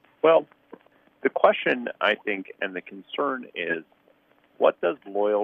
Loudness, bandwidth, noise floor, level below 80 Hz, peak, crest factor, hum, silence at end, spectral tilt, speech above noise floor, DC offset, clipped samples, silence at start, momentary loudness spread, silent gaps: -25 LUFS; 5 kHz; -62 dBFS; -76 dBFS; -4 dBFS; 22 dB; none; 0 s; -6.5 dB/octave; 38 dB; under 0.1%; under 0.1%; 0.25 s; 11 LU; none